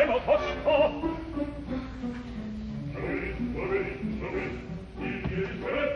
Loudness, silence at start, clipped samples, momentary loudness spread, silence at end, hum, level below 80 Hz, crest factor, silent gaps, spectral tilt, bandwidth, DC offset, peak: -31 LUFS; 0 s; under 0.1%; 12 LU; 0 s; none; -44 dBFS; 18 dB; none; -7.5 dB/octave; 9.8 kHz; under 0.1%; -12 dBFS